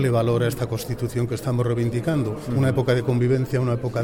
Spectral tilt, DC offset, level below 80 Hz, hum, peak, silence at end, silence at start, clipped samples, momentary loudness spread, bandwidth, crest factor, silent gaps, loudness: -7.5 dB/octave; under 0.1%; -46 dBFS; none; -8 dBFS; 0 s; 0 s; under 0.1%; 6 LU; 17 kHz; 14 dB; none; -23 LUFS